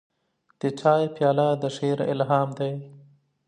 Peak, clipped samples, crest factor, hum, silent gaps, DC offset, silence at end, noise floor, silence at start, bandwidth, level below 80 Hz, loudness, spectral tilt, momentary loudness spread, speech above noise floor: -6 dBFS; under 0.1%; 18 dB; none; none; under 0.1%; 0.5 s; -69 dBFS; 0.65 s; 10.5 kHz; -74 dBFS; -24 LUFS; -7 dB/octave; 9 LU; 45 dB